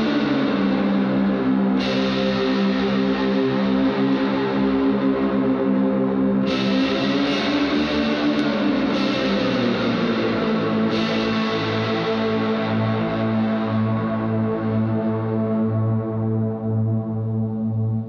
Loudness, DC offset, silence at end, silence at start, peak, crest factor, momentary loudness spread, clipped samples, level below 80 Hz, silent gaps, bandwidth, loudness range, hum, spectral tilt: -21 LUFS; under 0.1%; 0 s; 0 s; -8 dBFS; 12 dB; 3 LU; under 0.1%; -48 dBFS; none; 6.8 kHz; 2 LU; none; -7.5 dB/octave